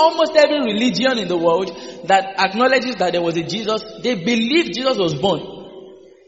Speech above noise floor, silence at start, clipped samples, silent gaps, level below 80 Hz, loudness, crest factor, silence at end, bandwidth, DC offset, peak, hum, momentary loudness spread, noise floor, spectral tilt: 23 dB; 0 s; under 0.1%; none; -58 dBFS; -18 LUFS; 18 dB; 0.3 s; 8 kHz; 0.1%; 0 dBFS; none; 9 LU; -41 dBFS; -2.5 dB/octave